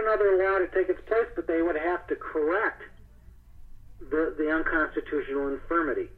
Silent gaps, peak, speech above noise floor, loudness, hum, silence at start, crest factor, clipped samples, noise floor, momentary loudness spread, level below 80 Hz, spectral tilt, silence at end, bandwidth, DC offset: none; -12 dBFS; 24 dB; -27 LUFS; none; 0 s; 14 dB; under 0.1%; -50 dBFS; 8 LU; -48 dBFS; -7.5 dB/octave; 0.05 s; 4.4 kHz; under 0.1%